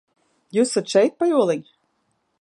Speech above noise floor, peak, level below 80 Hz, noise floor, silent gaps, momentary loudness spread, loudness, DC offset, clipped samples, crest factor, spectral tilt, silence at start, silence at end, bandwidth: 51 dB; -4 dBFS; -78 dBFS; -70 dBFS; none; 7 LU; -20 LUFS; under 0.1%; under 0.1%; 18 dB; -4.5 dB/octave; 0.55 s; 0.8 s; 11.5 kHz